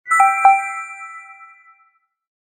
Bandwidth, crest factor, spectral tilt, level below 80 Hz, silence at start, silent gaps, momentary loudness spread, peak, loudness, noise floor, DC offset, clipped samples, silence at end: 14.5 kHz; 18 dB; 0 dB/octave; -72 dBFS; 0.05 s; none; 22 LU; 0 dBFS; -15 LUFS; -60 dBFS; under 0.1%; under 0.1%; 1.1 s